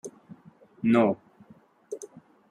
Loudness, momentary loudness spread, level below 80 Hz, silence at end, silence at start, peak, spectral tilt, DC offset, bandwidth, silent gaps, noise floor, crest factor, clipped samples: -25 LUFS; 22 LU; -72 dBFS; 0.45 s; 0.05 s; -8 dBFS; -6.5 dB/octave; under 0.1%; 11 kHz; none; -56 dBFS; 20 dB; under 0.1%